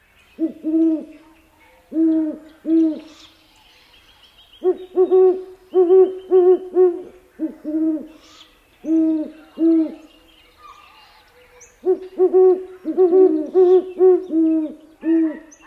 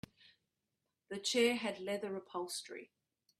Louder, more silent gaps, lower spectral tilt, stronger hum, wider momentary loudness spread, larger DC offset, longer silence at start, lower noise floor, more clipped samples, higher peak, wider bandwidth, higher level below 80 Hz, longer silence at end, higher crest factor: first, -18 LUFS vs -37 LUFS; neither; first, -6.5 dB/octave vs -2.5 dB/octave; neither; second, 14 LU vs 19 LU; neither; second, 0.4 s vs 1.1 s; second, -52 dBFS vs -88 dBFS; neither; first, -4 dBFS vs -20 dBFS; second, 6.6 kHz vs 15 kHz; first, -62 dBFS vs -80 dBFS; second, 0.25 s vs 0.55 s; second, 14 dB vs 20 dB